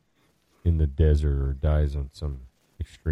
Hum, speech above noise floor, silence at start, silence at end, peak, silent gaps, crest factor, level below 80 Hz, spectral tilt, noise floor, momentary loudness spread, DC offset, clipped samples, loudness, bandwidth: none; 43 dB; 0.65 s; 0 s; -10 dBFS; none; 16 dB; -28 dBFS; -9 dB/octave; -67 dBFS; 16 LU; under 0.1%; under 0.1%; -26 LUFS; 5.4 kHz